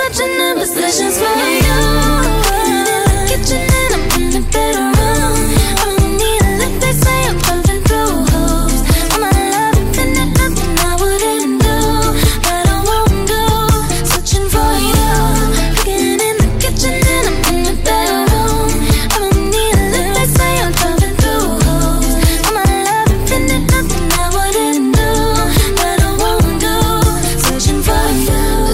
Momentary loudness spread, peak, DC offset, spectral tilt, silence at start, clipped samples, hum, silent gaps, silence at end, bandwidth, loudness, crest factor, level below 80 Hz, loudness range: 2 LU; 0 dBFS; under 0.1%; -4 dB/octave; 0 s; under 0.1%; none; none; 0 s; 16.5 kHz; -13 LUFS; 12 dB; -16 dBFS; 1 LU